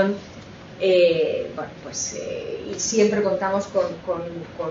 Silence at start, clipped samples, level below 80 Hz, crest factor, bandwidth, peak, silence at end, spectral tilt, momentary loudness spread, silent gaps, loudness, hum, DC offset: 0 s; under 0.1%; -56 dBFS; 16 dB; 7.8 kHz; -6 dBFS; 0 s; -4 dB/octave; 15 LU; none; -23 LUFS; none; under 0.1%